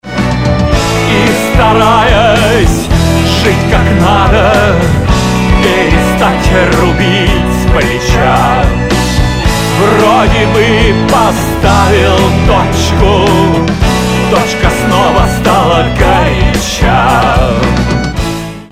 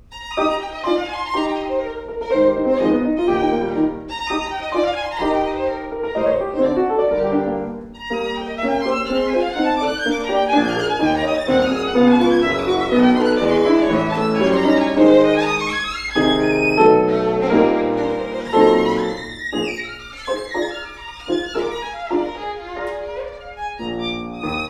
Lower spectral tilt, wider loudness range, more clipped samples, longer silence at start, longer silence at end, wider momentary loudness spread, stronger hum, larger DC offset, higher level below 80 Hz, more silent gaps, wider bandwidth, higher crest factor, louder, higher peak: about the same, -5.5 dB/octave vs -5.5 dB/octave; second, 1 LU vs 9 LU; first, 0.6% vs under 0.1%; about the same, 0.05 s vs 0.1 s; about the same, 0 s vs 0 s; second, 4 LU vs 13 LU; neither; first, 2% vs under 0.1%; first, -16 dBFS vs -44 dBFS; neither; first, 16 kHz vs 11.5 kHz; second, 8 dB vs 18 dB; first, -8 LUFS vs -18 LUFS; about the same, 0 dBFS vs 0 dBFS